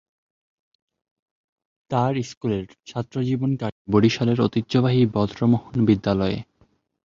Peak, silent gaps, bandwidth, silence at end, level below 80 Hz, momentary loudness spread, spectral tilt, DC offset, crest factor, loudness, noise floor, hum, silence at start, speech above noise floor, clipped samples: -6 dBFS; 2.37-2.41 s, 3.72-3.85 s; 7.4 kHz; 0.6 s; -50 dBFS; 9 LU; -7.5 dB/octave; under 0.1%; 18 dB; -22 LUFS; -62 dBFS; none; 1.9 s; 41 dB; under 0.1%